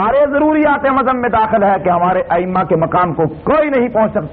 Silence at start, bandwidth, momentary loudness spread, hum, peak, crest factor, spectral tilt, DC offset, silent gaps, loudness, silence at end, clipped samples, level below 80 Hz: 0 s; 4.5 kHz; 3 LU; none; -2 dBFS; 10 dB; -6 dB/octave; under 0.1%; none; -13 LUFS; 0 s; under 0.1%; -40 dBFS